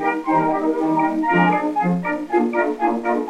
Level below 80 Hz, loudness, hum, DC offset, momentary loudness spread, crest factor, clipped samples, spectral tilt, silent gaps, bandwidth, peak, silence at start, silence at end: -58 dBFS; -19 LUFS; none; under 0.1%; 4 LU; 14 dB; under 0.1%; -8 dB/octave; none; 10.5 kHz; -4 dBFS; 0 s; 0 s